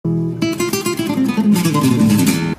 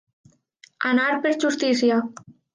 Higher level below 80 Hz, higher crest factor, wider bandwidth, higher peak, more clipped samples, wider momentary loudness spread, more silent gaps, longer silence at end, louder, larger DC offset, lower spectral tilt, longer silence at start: first, -48 dBFS vs -74 dBFS; about the same, 14 dB vs 16 dB; first, 15.5 kHz vs 9.8 kHz; first, -2 dBFS vs -8 dBFS; neither; about the same, 6 LU vs 6 LU; neither; second, 0.05 s vs 0.25 s; first, -16 LUFS vs -21 LUFS; neither; first, -5.5 dB/octave vs -3.5 dB/octave; second, 0.05 s vs 0.8 s